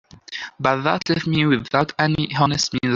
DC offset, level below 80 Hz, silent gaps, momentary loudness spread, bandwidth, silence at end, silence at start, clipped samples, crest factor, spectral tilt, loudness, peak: under 0.1%; -50 dBFS; none; 9 LU; 7.6 kHz; 0 s; 0.3 s; under 0.1%; 18 dB; -5 dB/octave; -20 LUFS; -2 dBFS